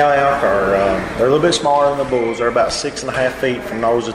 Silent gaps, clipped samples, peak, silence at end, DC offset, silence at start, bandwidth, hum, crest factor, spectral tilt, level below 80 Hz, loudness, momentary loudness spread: none; under 0.1%; -4 dBFS; 0 s; under 0.1%; 0 s; 15 kHz; none; 12 dB; -4.5 dB/octave; -40 dBFS; -16 LUFS; 6 LU